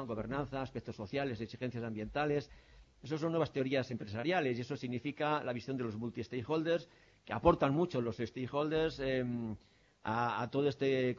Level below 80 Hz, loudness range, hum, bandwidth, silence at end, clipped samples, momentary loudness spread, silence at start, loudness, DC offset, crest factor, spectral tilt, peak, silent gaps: -58 dBFS; 3 LU; none; 7.4 kHz; 0 s; under 0.1%; 9 LU; 0 s; -36 LUFS; under 0.1%; 22 dB; -5.5 dB/octave; -14 dBFS; none